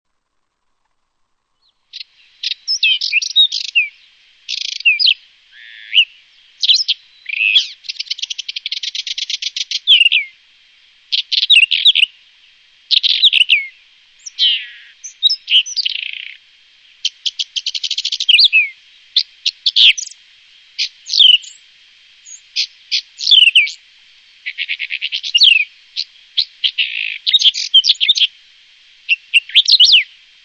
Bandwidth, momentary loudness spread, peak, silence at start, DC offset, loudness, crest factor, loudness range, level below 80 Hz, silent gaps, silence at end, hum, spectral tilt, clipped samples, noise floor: 9.2 kHz; 16 LU; 0 dBFS; 1.95 s; under 0.1%; -12 LUFS; 16 dB; 5 LU; -66 dBFS; none; 0.4 s; none; 6.5 dB/octave; under 0.1%; -68 dBFS